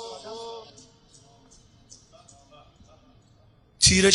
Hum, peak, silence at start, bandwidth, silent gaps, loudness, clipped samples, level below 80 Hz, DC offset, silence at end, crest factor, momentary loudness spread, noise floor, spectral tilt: none; -2 dBFS; 0 s; 11.5 kHz; none; -22 LUFS; under 0.1%; -46 dBFS; under 0.1%; 0 s; 26 dB; 26 LU; -58 dBFS; -2.5 dB/octave